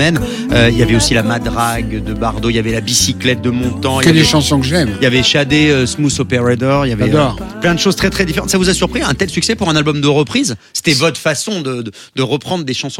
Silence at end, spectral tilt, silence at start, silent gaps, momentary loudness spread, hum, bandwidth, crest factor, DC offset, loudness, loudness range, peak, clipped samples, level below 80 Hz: 0 s; -4.5 dB/octave; 0 s; none; 7 LU; none; 16.5 kHz; 14 dB; under 0.1%; -13 LUFS; 3 LU; 0 dBFS; under 0.1%; -30 dBFS